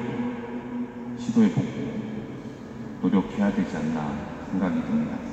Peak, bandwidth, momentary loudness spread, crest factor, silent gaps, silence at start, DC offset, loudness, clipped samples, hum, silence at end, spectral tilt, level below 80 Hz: -10 dBFS; 8.2 kHz; 13 LU; 16 dB; none; 0 s; under 0.1%; -27 LUFS; under 0.1%; none; 0 s; -7.5 dB/octave; -52 dBFS